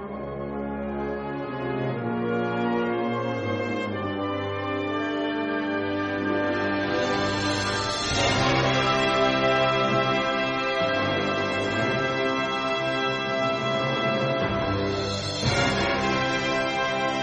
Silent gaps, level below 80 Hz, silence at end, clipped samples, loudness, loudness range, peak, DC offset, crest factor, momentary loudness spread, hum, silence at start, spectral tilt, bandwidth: none; -48 dBFS; 0 s; under 0.1%; -25 LUFS; 5 LU; -8 dBFS; under 0.1%; 16 dB; 7 LU; none; 0 s; -4.5 dB/octave; 9.4 kHz